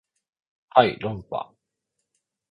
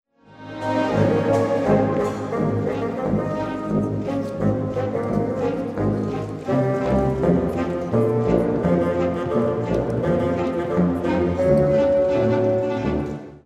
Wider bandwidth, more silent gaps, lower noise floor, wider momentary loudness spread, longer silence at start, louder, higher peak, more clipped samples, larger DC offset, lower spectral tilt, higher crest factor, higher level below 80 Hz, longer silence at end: second, 5 kHz vs 11.5 kHz; neither; first, -80 dBFS vs -41 dBFS; first, 14 LU vs 6 LU; first, 0.75 s vs 0.3 s; about the same, -23 LUFS vs -21 LUFS; about the same, -2 dBFS vs -4 dBFS; neither; neither; about the same, -7.5 dB/octave vs -8.5 dB/octave; first, 26 dB vs 16 dB; second, -60 dBFS vs -42 dBFS; first, 1.1 s vs 0.05 s